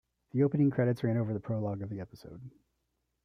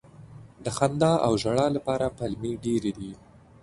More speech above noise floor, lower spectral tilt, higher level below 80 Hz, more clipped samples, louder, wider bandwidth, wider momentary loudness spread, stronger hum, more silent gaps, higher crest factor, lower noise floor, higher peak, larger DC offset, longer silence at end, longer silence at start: first, 50 dB vs 22 dB; first, -10 dB/octave vs -6 dB/octave; second, -66 dBFS vs -52 dBFS; neither; second, -31 LUFS vs -26 LUFS; about the same, 11 kHz vs 11.5 kHz; first, 21 LU vs 12 LU; neither; neither; about the same, 18 dB vs 20 dB; first, -81 dBFS vs -47 dBFS; second, -14 dBFS vs -6 dBFS; neither; first, 0.75 s vs 0.45 s; first, 0.35 s vs 0.2 s